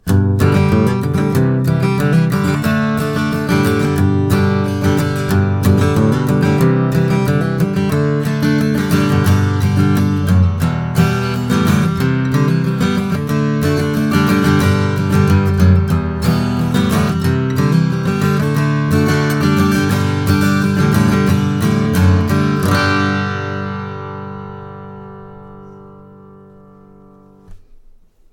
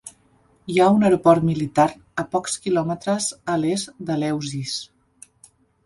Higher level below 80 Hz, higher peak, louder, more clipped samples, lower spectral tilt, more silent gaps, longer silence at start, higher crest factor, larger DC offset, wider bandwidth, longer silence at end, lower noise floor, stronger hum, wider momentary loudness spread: first, -36 dBFS vs -58 dBFS; about the same, 0 dBFS vs -2 dBFS; first, -14 LUFS vs -21 LUFS; neither; first, -7 dB/octave vs -5.5 dB/octave; neither; about the same, 0.05 s vs 0.05 s; second, 14 dB vs 20 dB; neither; first, 18.5 kHz vs 11.5 kHz; second, 0.75 s vs 1 s; second, -44 dBFS vs -59 dBFS; neither; second, 5 LU vs 12 LU